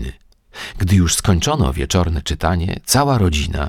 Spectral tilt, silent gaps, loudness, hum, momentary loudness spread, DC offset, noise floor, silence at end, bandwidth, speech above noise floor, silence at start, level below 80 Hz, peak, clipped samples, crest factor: -4.5 dB/octave; none; -17 LUFS; none; 9 LU; under 0.1%; -40 dBFS; 0 s; 17 kHz; 24 dB; 0 s; -26 dBFS; 0 dBFS; under 0.1%; 16 dB